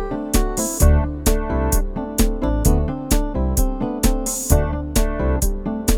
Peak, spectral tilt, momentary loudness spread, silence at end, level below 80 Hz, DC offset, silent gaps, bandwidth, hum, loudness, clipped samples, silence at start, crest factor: -2 dBFS; -5 dB/octave; 5 LU; 0 s; -20 dBFS; under 0.1%; none; 19.5 kHz; none; -20 LUFS; under 0.1%; 0 s; 16 dB